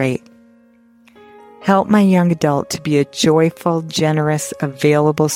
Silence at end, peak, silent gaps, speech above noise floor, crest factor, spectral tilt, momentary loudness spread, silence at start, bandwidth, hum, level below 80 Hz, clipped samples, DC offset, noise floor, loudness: 0 s; -2 dBFS; none; 35 dB; 14 dB; -5.5 dB/octave; 8 LU; 0 s; 16.5 kHz; none; -54 dBFS; under 0.1%; under 0.1%; -50 dBFS; -16 LUFS